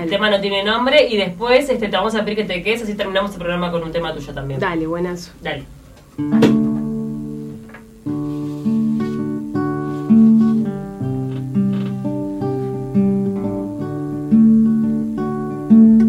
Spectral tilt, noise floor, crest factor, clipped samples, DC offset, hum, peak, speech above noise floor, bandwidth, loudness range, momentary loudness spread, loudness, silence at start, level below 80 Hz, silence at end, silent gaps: -7 dB/octave; -38 dBFS; 16 dB; under 0.1%; under 0.1%; none; -2 dBFS; 20 dB; 11.5 kHz; 5 LU; 13 LU; -18 LUFS; 0 s; -44 dBFS; 0 s; none